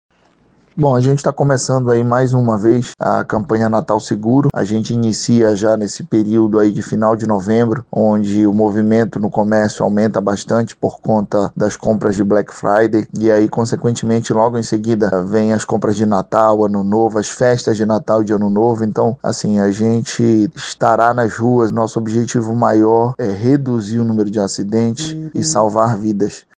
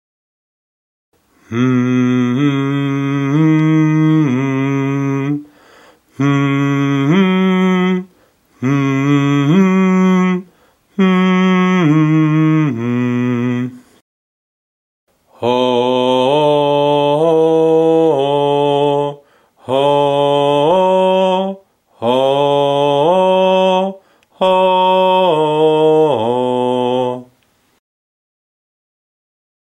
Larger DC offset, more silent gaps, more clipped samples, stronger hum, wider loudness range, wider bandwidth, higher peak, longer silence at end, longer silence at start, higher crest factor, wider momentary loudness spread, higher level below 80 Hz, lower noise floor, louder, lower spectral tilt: neither; second, none vs 14.01-15.07 s; neither; neither; second, 1 LU vs 4 LU; about the same, 9.8 kHz vs 9.6 kHz; about the same, 0 dBFS vs -2 dBFS; second, 0.2 s vs 2.4 s; second, 0.75 s vs 1.5 s; about the same, 14 dB vs 12 dB; about the same, 5 LU vs 7 LU; first, -50 dBFS vs -60 dBFS; second, -53 dBFS vs -57 dBFS; about the same, -15 LUFS vs -13 LUFS; about the same, -6.5 dB/octave vs -7.5 dB/octave